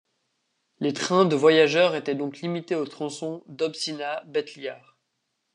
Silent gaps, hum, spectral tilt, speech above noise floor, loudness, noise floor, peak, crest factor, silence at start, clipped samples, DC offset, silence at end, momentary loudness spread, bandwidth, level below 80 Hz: none; none; -4.5 dB/octave; 53 dB; -24 LUFS; -77 dBFS; -6 dBFS; 20 dB; 0.8 s; under 0.1%; under 0.1%; 0.8 s; 15 LU; 10.5 kHz; -80 dBFS